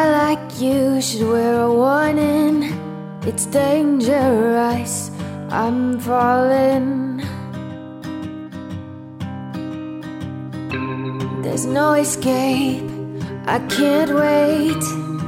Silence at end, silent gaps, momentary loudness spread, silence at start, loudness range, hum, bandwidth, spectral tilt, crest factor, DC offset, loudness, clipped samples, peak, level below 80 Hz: 0 s; none; 14 LU; 0 s; 11 LU; none; 16.5 kHz; -5 dB/octave; 14 dB; under 0.1%; -19 LUFS; under 0.1%; -4 dBFS; -54 dBFS